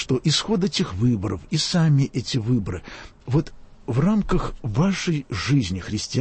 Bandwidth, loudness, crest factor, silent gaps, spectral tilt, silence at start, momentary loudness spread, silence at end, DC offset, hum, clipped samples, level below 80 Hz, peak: 8.8 kHz; -23 LUFS; 14 dB; none; -5.5 dB/octave; 0 s; 9 LU; 0 s; under 0.1%; none; under 0.1%; -38 dBFS; -8 dBFS